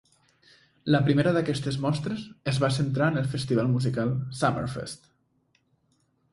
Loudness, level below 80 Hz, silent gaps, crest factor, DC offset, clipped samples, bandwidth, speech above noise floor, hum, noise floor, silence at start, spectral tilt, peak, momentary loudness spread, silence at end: -26 LUFS; -56 dBFS; none; 20 dB; under 0.1%; under 0.1%; 11.5 kHz; 44 dB; none; -70 dBFS; 0.85 s; -6.5 dB/octave; -8 dBFS; 11 LU; 1.35 s